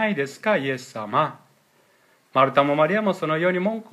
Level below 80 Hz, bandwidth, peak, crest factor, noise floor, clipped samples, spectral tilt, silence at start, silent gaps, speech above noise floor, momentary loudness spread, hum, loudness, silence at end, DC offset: -76 dBFS; 14.5 kHz; -4 dBFS; 20 dB; -60 dBFS; under 0.1%; -6 dB/octave; 0 s; none; 39 dB; 8 LU; none; -22 LUFS; 0.1 s; under 0.1%